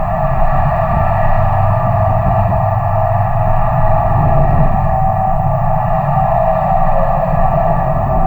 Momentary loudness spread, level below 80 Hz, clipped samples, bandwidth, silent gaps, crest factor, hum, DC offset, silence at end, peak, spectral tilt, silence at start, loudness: 2 LU; -18 dBFS; under 0.1%; 3.2 kHz; none; 12 dB; none; under 0.1%; 0 s; 0 dBFS; -10.5 dB/octave; 0 s; -14 LUFS